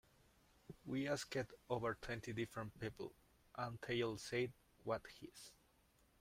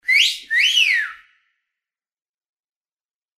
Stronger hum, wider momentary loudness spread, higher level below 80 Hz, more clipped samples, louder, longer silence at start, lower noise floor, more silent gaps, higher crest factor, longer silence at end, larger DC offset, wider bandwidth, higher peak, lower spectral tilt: neither; first, 15 LU vs 7 LU; first, -70 dBFS vs -76 dBFS; neither; second, -45 LUFS vs -15 LUFS; first, 0.7 s vs 0.05 s; second, -75 dBFS vs under -90 dBFS; neither; about the same, 20 dB vs 18 dB; second, 0.7 s vs 2.2 s; neither; about the same, 16 kHz vs 15.5 kHz; second, -26 dBFS vs -4 dBFS; first, -5 dB/octave vs 6.5 dB/octave